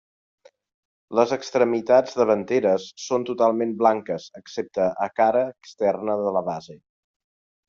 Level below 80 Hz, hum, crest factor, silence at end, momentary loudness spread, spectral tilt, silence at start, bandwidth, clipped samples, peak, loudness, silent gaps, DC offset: -68 dBFS; none; 20 dB; 0.9 s; 11 LU; -5.5 dB/octave; 1.1 s; 7.6 kHz; under 0.1%; -4 dBFS; -23 LUFS; none; under 0.1%